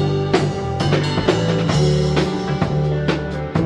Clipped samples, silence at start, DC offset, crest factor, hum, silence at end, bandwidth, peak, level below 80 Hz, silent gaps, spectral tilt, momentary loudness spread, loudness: under 0.1%; 0 s; under 0.1%; 14 dB; none; 0 s; 10 kHz; -4 dBFS; -34 dBFS; none; -6.5 dB/octave; 5 LU; -19 LUFS